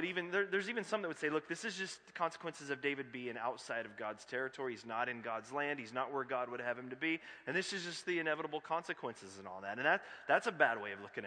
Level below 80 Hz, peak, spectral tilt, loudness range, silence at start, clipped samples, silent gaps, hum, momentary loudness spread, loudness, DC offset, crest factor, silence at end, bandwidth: -86 dBFS; -14 dBFS; -4 dB/octave; 4 LU; 0 s; under 0.1%; none; none; 10 LU; -39 LUFS; under 0.1%; 26 dB; 0 s; 10.5 kHz